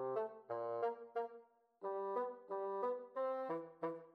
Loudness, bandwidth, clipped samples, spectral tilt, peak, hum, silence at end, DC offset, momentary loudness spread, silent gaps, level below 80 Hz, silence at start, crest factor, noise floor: -44 LUFS; 5.2 kHz; under 0.1%; -8 dB/octave; -28 dBFS; none; 0.05 s; under 0.1%; 5 LU; none; under -90 dBFS; 0 s; 14 dB; -63 dBFS